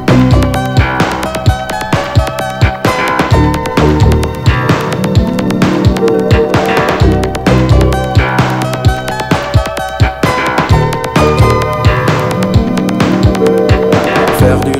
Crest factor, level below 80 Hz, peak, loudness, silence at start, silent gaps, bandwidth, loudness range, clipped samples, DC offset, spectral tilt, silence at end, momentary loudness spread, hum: 10 dB; -20 dBFS; 0 dBFS; -11 LUFS; 0 s; none; 16.5 kHz; 2 LU; 2%; under 0.1%; -6.5 dB/octave; 0 s; 4 LU; none